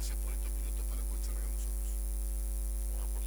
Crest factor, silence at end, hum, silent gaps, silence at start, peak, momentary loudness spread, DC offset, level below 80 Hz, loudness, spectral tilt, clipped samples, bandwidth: 10 dB; 0 s; none; none; 0 s; -24 dBFS; 0 LU; under 0.1%; -34 dBFS; -38 LUFS; -4.5 dB/octave; under 0.1%; over 20 kHz